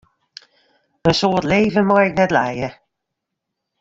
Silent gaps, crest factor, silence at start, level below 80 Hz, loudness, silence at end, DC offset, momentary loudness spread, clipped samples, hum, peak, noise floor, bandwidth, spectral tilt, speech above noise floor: none; 18 dB; 1.05 s; -48 dBFS; -17 LUFS; 1.1 s; under 0.1%; 9 LU; under 0.1%; none; -2 dBFS; -79 dBFS; 7.8 kHz; -6 dB/octave; 63 dB